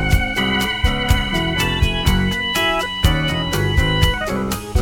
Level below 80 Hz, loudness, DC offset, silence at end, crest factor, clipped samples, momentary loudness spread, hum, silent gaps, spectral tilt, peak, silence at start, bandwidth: -24 dBFS; -18 LUFS; under 0.1%; 0 s; 16 dB; under 0.1%; 2 LU; none; none; -4.5 dB/octave; 0 dBFS; 0 s; 19.5 kHz